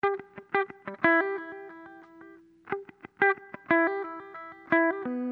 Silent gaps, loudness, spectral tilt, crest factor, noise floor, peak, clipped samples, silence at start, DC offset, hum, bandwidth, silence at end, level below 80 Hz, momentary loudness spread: none; -28 LUFS; -8 dB/octave; 22 dB; -52 dBFS; -8 dBFS; under 0.1%; 0.05 s; under 0.1%; none; 4.8 kHz; 0 s; -74 dBFS; 20 LU